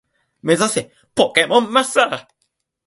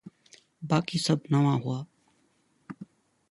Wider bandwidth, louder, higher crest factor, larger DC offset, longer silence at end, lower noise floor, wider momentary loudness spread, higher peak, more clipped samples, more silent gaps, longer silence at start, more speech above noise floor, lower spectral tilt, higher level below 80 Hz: about the same, 12 kHz vs 11.5 kHz; first, -17 LUFS vs -27 LUFS; about the same, 18 dB vs 20 dB; neither; first, 0.65 s vs 0.45 s; about the same, -71 dBFS vs -69 dBFS; second, 11 LU vs 23 LU; first, 0 dBFS vs -10 dBFS; neither; neither; first, 0.45 s vs 0.05 s; first, 54 dB vs 43 dB; second, -3 dB/octave vs -6 dB/octave; first, -60 dBFS vs -68 dBFS